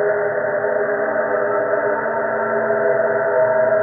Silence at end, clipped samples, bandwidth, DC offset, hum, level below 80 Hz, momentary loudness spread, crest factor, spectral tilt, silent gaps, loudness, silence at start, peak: 0 s; under 0.1%; 2.8 kHz; under 0.1%; none; -64 dBFS; 4 LU; 12 dB; 1 dB/octave; none; -19 LUFS; 0 s; -6 dBFS